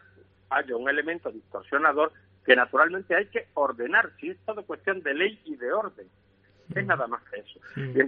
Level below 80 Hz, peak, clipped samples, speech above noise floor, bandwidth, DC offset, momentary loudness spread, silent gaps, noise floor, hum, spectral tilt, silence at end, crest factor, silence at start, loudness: -72 dBFS; -2 dBFS; under 0.1%; 31 dB; 5 kHz; under 0.1%; 14 LU; none; -58 dBFS; none; -2.5 dB/octave; 0 s; 26 dB; 0.5 s; -26 LUFS